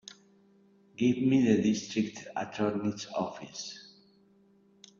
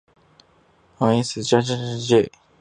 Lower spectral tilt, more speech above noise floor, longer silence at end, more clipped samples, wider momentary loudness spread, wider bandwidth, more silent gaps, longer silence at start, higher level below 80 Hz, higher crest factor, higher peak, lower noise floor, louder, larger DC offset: about the same, -5.5 dB/octave vs -5.5 dB/octave; second, 34 dB vs 38 dB; first, 1.15 s vs 0.3 s; neither; first, 17 LU vs 7 LU; second, 7.6 kHz vs 10 kHz; neither; about the same, 1 s vs 1 s; second, -70 dBFS vs -58 dBFS; about the same, 18 dB vs 20 dB; second, -12 dBFS vs -2 dBFS; first, -64 dBFS vs -58 dBFS; second, -30 LUFS vs -21 LUFS; neither